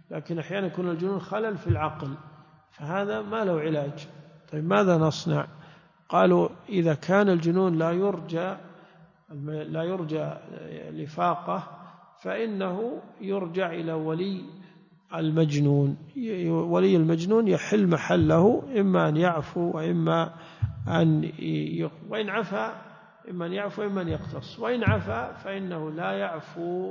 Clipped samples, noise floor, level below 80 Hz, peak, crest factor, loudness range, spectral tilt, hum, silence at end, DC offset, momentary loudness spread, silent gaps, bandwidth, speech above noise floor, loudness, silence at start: under 0.1%; -55 dBFS; -52 dBFS; -8 dBFS; 18 dB; 8 LU; -7.5 dB/octave; none; 0 s; under 0.1%; 15 LU; none; 7.4 kHz; 29 dB; -26 LUFS; 0.1 s